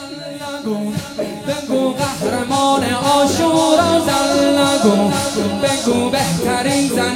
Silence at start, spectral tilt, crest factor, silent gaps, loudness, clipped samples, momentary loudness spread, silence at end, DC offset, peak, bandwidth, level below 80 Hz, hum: 0 s; -4 dB/octave; 16 dB; none; -16 LUFS; under 0.1%; 10 LU; 0 s; under 0.1%; 0 dBFS; 16.5 kHz; -46 dBFS; none